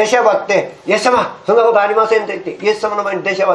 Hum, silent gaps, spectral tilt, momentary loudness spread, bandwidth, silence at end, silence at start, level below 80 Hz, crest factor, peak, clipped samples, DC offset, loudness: none; none; -3.5 dB/octave; 6 LU; 12 kHz; 0 s; 0 s; -60 dBFS; 14 dB; 0 dBFS; under 0.1%; under 0.1%; -14 LUFS